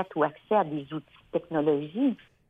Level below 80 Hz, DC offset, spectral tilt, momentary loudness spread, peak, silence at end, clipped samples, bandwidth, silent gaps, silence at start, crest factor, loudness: -68 dBFS; under 0.1%; -9 dB/octave; 9 LU; -10 dBFS; 0.35 s; under 0.1%; 3.9 kHz; none; 0 s; 18 dB; -28 LUFS